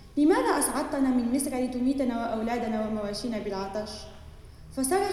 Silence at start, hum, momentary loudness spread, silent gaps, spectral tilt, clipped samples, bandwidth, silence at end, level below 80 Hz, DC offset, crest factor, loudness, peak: 0 s; none; 11 LU; none; -4 dB/octave; under 0.1%; 14.5 kHz; 0 s; -50 dBFS; under 0.1%; 16 dB; -28 LUFS; -12 dBFS